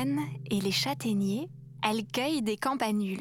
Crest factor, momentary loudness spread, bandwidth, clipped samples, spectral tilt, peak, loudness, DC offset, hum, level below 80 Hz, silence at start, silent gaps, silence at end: 20 dB; 4 LU; 17.5 kHz; under 0.1%; -4.5 dB/octave; -10 dBFS; -30 LUFS; under 0.1%; none; -66 dBFS; 0 s; none; 0 s